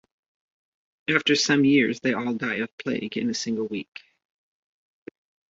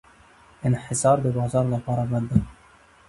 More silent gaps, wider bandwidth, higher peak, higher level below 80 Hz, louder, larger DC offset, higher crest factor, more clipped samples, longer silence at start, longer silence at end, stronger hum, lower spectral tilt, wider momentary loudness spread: first, 2.72-2.78 s vs none; second, 7.8 kHz vs 11.5 kHz; about the same, -4 dBFS vs -4 dBFS; second, -68 dBFS vs -44 dBFS; about the same, -24 LUFS vs -24 LUFS; neither; about the same, 22 dB vs 20 dB; neither; first, 1.1 s vs 0.6 s; first, 1.65 s vs 0.55 s; neither; second, -4 dB/octave vs -7 dB/octave; first, 12 LU vs 6 LU